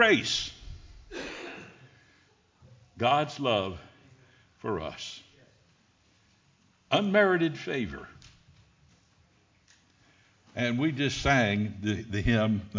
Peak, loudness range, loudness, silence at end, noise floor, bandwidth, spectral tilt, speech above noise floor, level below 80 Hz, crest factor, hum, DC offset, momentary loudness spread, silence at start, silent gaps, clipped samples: -8 dBFS; 7 LU; -28 LUFS; 0 s; -66 dBFS; 7.6 kHz; -5 dB/octave; 38 dB; -50 dBFS; 22 dB; none; under 0.1%; 22 LU; 0 s; none; under 0.1%